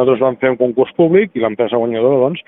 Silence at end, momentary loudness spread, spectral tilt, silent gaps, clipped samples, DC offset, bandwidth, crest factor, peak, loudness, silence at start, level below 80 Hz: 0.05 s; 4 LU; -11.5 dB/octave; none; under 0.1%; under 0.1%; 3.9 kHz; 14 dB; 0 dBFS; -14 LUFS; 0 s; -58 dBFS